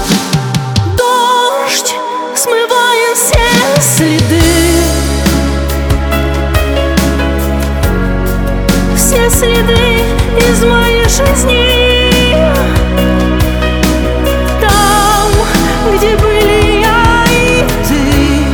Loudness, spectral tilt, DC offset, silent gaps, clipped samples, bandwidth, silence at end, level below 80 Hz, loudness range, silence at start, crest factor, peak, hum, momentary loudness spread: -10 LUFS; -4 dB/octave; under 0.1%; none; under 0.1%; over 20 kHz; 0 s; -16 dBFS; 3 LU; 0 s; 10 dB; 0 dBFS; none; 5 LU